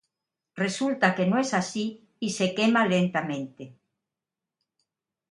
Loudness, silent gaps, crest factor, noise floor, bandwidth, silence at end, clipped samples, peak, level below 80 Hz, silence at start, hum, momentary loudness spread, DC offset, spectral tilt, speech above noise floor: -26 LUFS; none; 24 dB; -89 dBFS; 11.5 kHz; 1.6 s; under 0.1%; -4 dBFS; -72 dBFS; 0.55 s; none; 12 LU; under 0.1%; -5 dB/octave; 63 dB